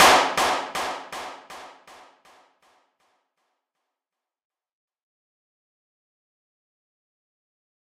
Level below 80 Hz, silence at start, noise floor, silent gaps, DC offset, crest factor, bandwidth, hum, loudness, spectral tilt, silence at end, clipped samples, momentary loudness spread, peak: -62 dBFS; 0 s; -89 dBFS; none; under 0.1%; 24 dB; 15.5 kHz; none; -22 LUFS; -1 dB/octave; 6.3 s; under 0.1%; 25 LU; -4 dBFS